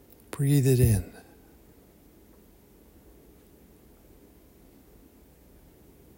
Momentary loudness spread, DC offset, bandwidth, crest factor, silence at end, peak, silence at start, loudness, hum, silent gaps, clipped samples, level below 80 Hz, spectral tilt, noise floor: 23 LU; under 0.1%; 16.5 kHz; 22 dB; 5.05 s; -10 dBFS; 0.35 s; -24 LUFS; none; none; under 0.1%; -46 dBFS; -7 dB/octave; -56 dBFS